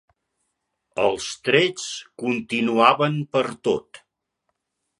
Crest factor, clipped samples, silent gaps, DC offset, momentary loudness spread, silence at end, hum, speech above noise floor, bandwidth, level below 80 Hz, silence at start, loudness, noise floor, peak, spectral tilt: 24 dB; under 0.1%; none; under 0.1%; 12 LU; 1.05 s; none; 55 dB; 11.5 kHz; -64 dBFS; 0.95 s; -22 LUFS; -77 dBFS; 0 dBFS; -4.5 dB/octave